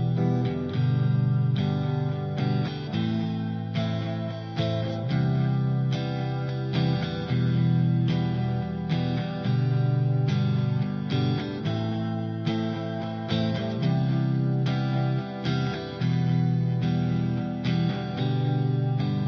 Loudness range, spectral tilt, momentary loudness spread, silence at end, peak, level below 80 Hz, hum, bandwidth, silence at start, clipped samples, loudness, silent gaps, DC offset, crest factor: 2 LU; -8.5 dB/octave; 5 LU; 0 s; -14 dBFS; -58 dBFS; none; 6.2 kHz; 0 s; under 0.1%; -26 LUFS; none; under 0.1%; 12 dB